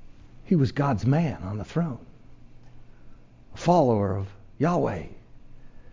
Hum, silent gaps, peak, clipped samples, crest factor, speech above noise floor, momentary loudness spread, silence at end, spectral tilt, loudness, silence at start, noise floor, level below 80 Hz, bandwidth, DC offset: none; none; -8 dBFS; under 0.1%; 18 dB; 22 dB; 14 LU; 0.05 s; -8 dB/octave; -25 LUFS; 0 s; -46 dBFS; -48 dBFS; 7.6 kHz; under 0.1%